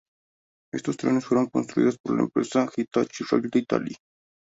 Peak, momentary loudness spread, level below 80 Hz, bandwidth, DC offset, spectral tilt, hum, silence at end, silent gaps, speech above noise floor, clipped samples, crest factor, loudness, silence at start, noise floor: -6 dBFS; 8 LU; -66 dBFS; 8 kHz; under 0.1%; -6 dB/octave; none; 0.55 s; 2.00-2.04 s; over 66 dB; under 0.1%; 20 dB; -25 LUFS; 0.75 s; under -90 dBFS